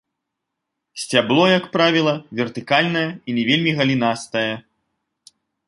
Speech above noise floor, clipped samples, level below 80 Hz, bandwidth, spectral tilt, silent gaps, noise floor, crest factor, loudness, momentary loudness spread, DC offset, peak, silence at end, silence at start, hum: 61 dB; under 0.1%; -64 dBFS; 11.5 kHz; -5 dB/octave; none; -80 dBFS; 18 dB; -18 LUFS; 10 LU; under 0.1%; -2 dBFS; 1.1 s; 0.95 s; none